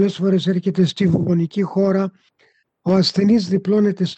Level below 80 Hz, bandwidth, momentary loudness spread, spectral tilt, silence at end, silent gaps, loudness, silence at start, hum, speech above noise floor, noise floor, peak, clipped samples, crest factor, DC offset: -58 dBFS; 8.2 kHz; 5 LU; -7.5 dB/octave; 0.05 s; none; -18 LUFS; 0 s; none; 43 dB; -60 dBFS; -6 dBFS; under 0.1%; 12 dB; under 0.1%